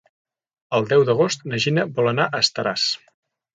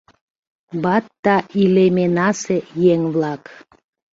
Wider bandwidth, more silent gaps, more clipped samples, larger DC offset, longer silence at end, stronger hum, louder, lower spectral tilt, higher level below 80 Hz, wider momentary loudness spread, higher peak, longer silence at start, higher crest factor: first, 9.4 kHz vs 7.8 kHz; second, none vs 1.19-1.23 s; neither; neither; second, 0.6 s vs 0.75 s; neither; second, -20 LUFS vs -17 LUFS; second, -4.5 dB/octave vs -6.5 dB/octave; about the same, -64 dBFS vs -60 dBFS; second, 6 LU vs 9 LU; about the same, -4 dBFS vs -2 dBFS; about the same, 0.7 s vs 0.75 s; about the same, 18 dB vs 16 dB